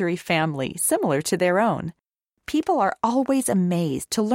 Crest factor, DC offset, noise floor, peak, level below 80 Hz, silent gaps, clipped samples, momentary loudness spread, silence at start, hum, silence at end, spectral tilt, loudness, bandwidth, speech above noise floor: 16 dB; under 0.1%; -45 dBFS; -8 dBFS; -58 dBFS; none; under 0.1%; 6 LU; 0 s; none; 0 s; -5 dB/octave; -22 LUFS; 16.5 kHz; 23 dB